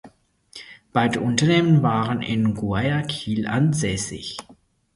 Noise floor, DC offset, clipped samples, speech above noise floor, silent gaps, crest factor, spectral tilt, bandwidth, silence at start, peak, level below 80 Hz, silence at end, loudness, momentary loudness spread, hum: -52 dBFS; under 0.1%; under 0.1%; 32 dB; none; 20 dB; -5.5 dB/octave; 11.5 kHz; 0.05 s; -2 dBFS; -50 dBFS; 0.45 s; -21 LUFS; 19 LU; none